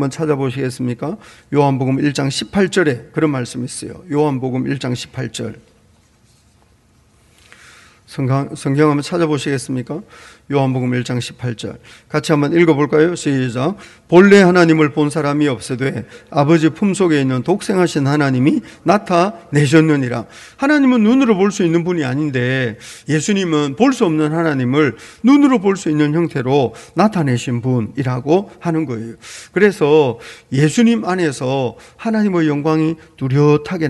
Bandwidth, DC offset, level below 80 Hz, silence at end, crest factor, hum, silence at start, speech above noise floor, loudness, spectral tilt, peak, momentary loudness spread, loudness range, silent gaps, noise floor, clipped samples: 12 kHz; under 0.1%; -54 dBFS; 0 s; 16 dB; none; 0 s; 38 dB; -16 LUFS; -6.5 dB/octave; 0 dBFS; 12 LU; 8 LU; none; -53 dBFS; under 0.1%